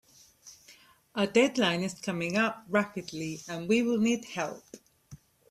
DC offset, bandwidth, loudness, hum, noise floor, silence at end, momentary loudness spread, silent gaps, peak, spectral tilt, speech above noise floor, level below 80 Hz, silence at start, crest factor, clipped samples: under 0.1%; 14.5 kHz; -29 LUFS; none; -58 dBFS; 0.35 s; 12 LU; none; -10 dBFS; -4.5 dB/octave; 29 dB; -70 dBFS; 0.45 s; 20 dB; under 0.1%